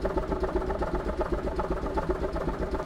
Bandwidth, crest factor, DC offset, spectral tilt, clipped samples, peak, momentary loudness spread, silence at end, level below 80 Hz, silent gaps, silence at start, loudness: 11.5 kHz; 16 dB; under 0.1%; -7.5 dB/octave; under 0.1%; -14 dBFS; 1 LU; 0 s; -34 dBFS; none; 0 s; -31 LUFS